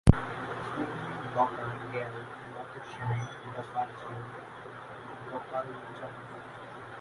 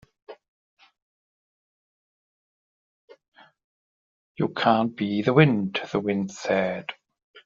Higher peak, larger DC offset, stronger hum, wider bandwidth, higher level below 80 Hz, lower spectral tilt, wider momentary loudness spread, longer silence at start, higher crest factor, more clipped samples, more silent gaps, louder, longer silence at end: first, 0 dBFS vs -4 dBFS; neither; neither; first, 11.5 kHz vs 7.4 kHz; first, -42 dBFS vs -68 dBFS; first, -7.5 dB/octave vs -5 dB/octave; first, 14 LU vs 11 LU; second, 0.05 s vs 0.3 s; first, 32 dB vs 24 dB; neither; second, none vs 0.48-0.77 s, 1.02-3.08 s, 3.28-3.32 s, 3.64-4.35 s, 7.24-7.34 s; second, -36 LUFS vs -24 LUFS; about the same, 0 s vs 0.05 s